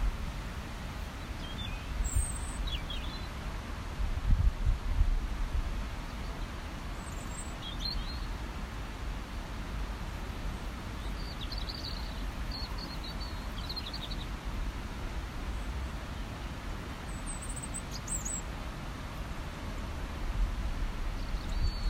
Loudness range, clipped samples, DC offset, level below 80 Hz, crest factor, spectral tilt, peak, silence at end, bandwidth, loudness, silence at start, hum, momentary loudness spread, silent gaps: 4 LU; under 0.1%; under 0.1%; -36 dBFS; 22 dB; -4 dB/octave; -14 dBFS; 0 s; 16 kHz; -38 LUFS; 0 s; none; 7 LU; none